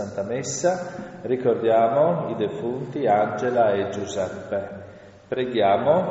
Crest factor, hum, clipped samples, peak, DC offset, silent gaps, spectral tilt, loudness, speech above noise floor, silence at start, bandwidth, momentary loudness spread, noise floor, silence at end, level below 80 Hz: 16 dB; none; under 0.1%; -6 dBFS; under 0.1%; none; -5 dB/octave; -23 LUFS; 22 dB; 0 s; 8 kHz; 11 LU; -44 dBFS; 0 s; -62 dBFS